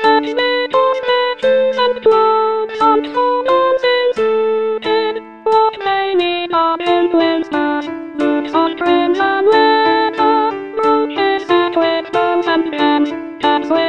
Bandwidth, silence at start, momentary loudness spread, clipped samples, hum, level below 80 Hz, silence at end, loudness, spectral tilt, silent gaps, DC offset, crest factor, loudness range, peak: 8.8 kHz; 0 s; 5 LU; under 0.1%; none; -58 dBFS; 0 s; -14 LUFS; -5 dB/octave; none; 0.3%; 14 dB; 2 LU; 0 dBFS